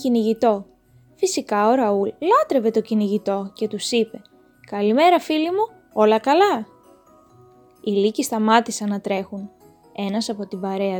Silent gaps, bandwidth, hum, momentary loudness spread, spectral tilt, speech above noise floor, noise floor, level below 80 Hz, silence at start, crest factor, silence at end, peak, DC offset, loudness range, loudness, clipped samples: none; 19 kHz; none; 11 LU; -4.5 dB/octave; 34 dB; -54 dBFS; -66 dBFS; 0 s; 20 dB; 0 s; -2 dBFS; under 0.1%; 3 LU; -20 LUFS; under 0.1%